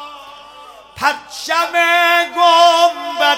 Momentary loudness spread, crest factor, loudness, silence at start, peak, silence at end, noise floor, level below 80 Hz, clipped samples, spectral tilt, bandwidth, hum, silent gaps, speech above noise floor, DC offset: 9 LU; 14 dB; -13 LUFS; 0 s; 0 dBFS; 0 s; -39 dBFS; -60 dBFS; under 0.1%; -0.5 dB/octave; 16.5 kHz; none; none; 25 dB; under 0.1%